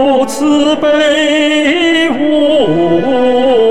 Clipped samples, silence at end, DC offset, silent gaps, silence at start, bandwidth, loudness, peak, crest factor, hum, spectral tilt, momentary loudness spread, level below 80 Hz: under 0.1%; 0 s; 3%; none; 0 s; 13.5 kHz; -10 LUFS; -2 dBFS; 8 dB; none; -4.5 dB/octave; 2 LU; -44 dBFS